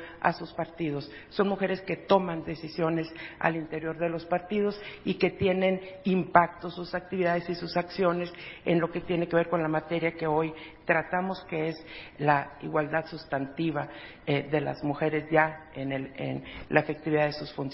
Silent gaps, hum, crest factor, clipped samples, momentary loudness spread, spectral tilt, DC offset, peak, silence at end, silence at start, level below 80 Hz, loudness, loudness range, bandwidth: none; none; 26 dB; under 0.1%; 10 LU; -10.5 dB/octave; under 0.1%; -4 dBFS; 0 s; 0 s; -58 dBFS; -29 LUFS; 2 LU; 5.8 kHz